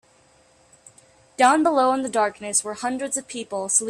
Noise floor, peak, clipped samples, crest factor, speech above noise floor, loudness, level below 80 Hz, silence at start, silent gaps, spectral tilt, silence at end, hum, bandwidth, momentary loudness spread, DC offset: -57 dBFS; -4 dBFS; under 0.1%; 18 dB; 36 dB; -21 LUFS; -68 dBFS; 1.4 s; none; -2 dB/octave; 0 s; none; 14.5 kHz; 11 LU; under 0.1%